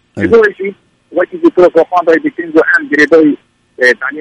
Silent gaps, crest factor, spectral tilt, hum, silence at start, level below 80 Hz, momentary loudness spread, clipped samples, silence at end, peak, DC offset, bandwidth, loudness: none; 10 dB; -6 dB/octave; none; 0.15 s; -48 dBFS; 10 LU; 0.1%; 0 s; 0 dBFS; under 0.1%; 10.5 kHz; -10 LUFS